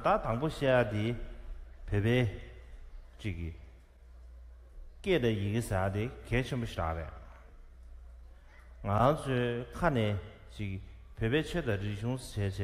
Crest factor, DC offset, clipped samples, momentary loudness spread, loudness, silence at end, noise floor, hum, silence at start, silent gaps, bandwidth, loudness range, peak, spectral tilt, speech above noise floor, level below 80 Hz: 22 dB; under 0.1%; under 0.1%; 23 LU; -33 LUFS; 0 s; -54 dBFS; none; 0 s; none; 14.5 kHz; 5 LU; -12 dBFS; -7 dB/octave; 23 dB; -46 dBFS